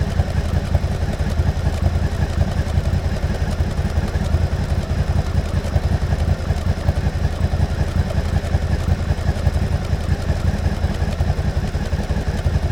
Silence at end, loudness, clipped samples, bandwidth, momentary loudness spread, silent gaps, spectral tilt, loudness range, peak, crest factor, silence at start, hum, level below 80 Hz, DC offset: 0 s; -21 LUFS; under 0.1%; 12.5 kHz; 2 LU; none; -7 dB/octave; 0 LU; -2 dBFS; 16 dB; 0 s; none; -22 dBFS; under 0.1%